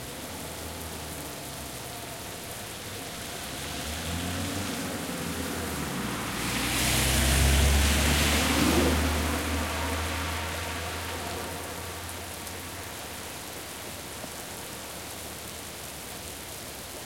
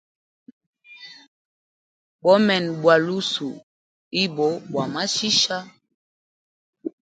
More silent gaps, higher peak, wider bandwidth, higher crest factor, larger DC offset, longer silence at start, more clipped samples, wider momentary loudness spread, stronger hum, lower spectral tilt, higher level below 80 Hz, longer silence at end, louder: second, none vs 1.28-2.19 s, 3.63-4.11 s, 5.94-6.73 s; second, -10 dBFS vs -2 dBFS; first, 17 kHz vs 9.4 kHz; about the same, 20 dB vs 22 dB; neither; second, 0 s vs 0.9 s; neither; second, 14 LU vs 24 LU; neither; about the same, -3.5 dB/octave vs -3.5 dB/octave; first, -36 dBFS vs -70 dBFS; second, 0 s vs 0.15 s; second, -30 LUFS vs -21 LUFS